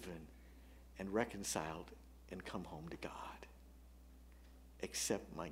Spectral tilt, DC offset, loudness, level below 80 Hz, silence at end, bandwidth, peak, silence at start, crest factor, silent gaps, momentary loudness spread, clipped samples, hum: -3.5 dB/octave; under 0.1%; -45 LUFS; -60 dBFS; 0 s; 16 kHz; -20 dBFS; 0 s; 26 dB; none; 22 LU; under 0.1%; 60 Hz at -60 dBFS